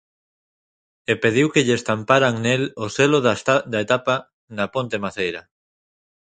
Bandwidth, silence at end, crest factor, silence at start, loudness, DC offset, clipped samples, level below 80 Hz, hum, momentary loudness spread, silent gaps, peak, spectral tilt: 9.6 kHz; 0.9 s; 20 dB; 1.1 s; -20 LUFS; under 0.1%; under 0.1%; -58 dBFS; none; 9 LU; 4.33-4.48 s; 0 dBFS; -5 dB/octave